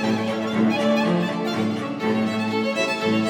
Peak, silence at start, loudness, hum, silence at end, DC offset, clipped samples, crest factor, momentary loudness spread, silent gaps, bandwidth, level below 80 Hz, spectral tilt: -8 dBFS; 0 s; -22 LUFS; none; 0 s; under 0.1%; under 0.1%; 12 dB; 4 LU; none; 13.5 kHz; -70 dBFS; -5.5 dB/octave